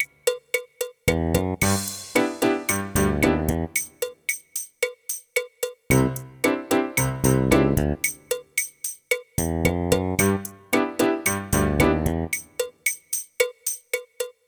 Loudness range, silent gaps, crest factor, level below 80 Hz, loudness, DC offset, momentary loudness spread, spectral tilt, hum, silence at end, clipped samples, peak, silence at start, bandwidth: 3 LU; none; 20 dB; -38 dBFS; -24 LUFS; under 0.1%; 8 LU; -4.5 dB/octave; none; 0.15 s; under 0.1%; -4 dBFS; 0 s; over 20 kHz